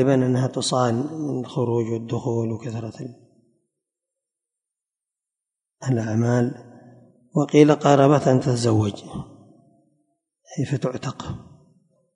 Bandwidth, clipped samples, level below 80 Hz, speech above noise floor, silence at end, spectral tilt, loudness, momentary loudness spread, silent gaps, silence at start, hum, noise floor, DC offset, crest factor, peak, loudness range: 10.5 kHz; under 0.1%; -56 dBFS; 68 dB; 0.75 s; -6.5 dB/octave; -21 LUFS; 20 LU; none; 0 s; none; -89 dBFS; under 0.1%; 22 dB; -2 dBFS; 13 LU